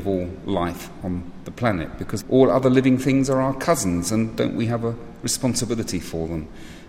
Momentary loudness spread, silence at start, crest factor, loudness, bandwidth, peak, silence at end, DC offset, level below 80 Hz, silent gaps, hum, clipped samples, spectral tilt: 13 LU; 0 s; 20 dB; -22 LUFS; 16 kHz; -2 dBFS; 0 s; under 0.1%; -44 dBFS; none; none; under 0.1%; -5.5 dB/octave